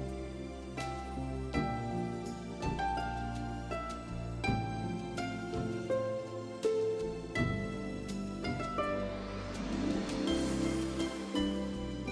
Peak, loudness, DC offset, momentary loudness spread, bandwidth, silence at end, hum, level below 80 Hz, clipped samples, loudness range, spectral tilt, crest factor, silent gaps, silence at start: -20 dBFS; -37 LUFS; under 0.1%; 7 LU; 11 kHz; 0 s; none; -48 dBFS; under 0.1%; 2 LU; -6 dB/octave; 16 dB; none; 0 s